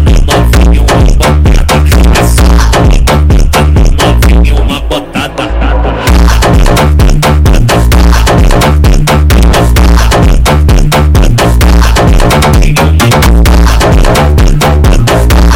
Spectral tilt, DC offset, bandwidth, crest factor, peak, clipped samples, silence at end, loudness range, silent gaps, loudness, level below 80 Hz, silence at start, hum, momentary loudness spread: -5.5 dB/octave; under 0.1%; 17 kHz; 4 dB; 0 dBFS; under 0.1%; 0 s; 2 LU; none; -6 LUFS; -6 dBFS; 0 s; none; 2 LU